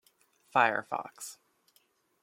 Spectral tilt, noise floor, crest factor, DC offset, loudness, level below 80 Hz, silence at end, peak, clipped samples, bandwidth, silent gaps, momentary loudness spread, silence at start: -3 dB/octave; -71 dBFS; 26 dB; under 0.1%; -30 LUFS; -86 dBFS; 0.9 s; -10 dBFS; under 0.1%; 16.5 kHz; none; 18 LU; 0.55 s